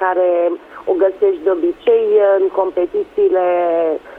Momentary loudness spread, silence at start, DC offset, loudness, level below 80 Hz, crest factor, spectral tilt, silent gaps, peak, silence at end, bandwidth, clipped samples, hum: 7 LU; 0 s; under 0.1%; -15 LUFS; -56 dBFS; 12 dB; -7 dB/octave; none; -2 dBFS; 0 s; 3.9 kHz; under 0.1%; none